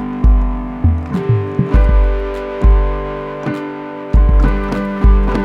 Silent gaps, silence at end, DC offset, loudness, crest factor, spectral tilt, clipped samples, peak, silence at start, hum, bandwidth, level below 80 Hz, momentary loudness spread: none; 0 s; 0.2%; -16 LUFS; 12 dB; -9 dB/octave; under 0.1%; 0 dBFS; 0 s; 50 Hz at -25 dBFS; 4.6 kHz; -14 dBFS; 9 LU